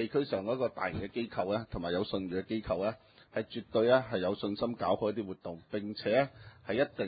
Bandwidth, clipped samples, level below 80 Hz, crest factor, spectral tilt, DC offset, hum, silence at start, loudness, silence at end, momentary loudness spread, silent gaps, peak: 4.9 kHz; under 0.1%; -58 dBFS; 20 dB; -4.5 dB/octave; under 0.1%; none; 0 s; -33 LUFS; 0 s; 10 LU; none; -12 dBFS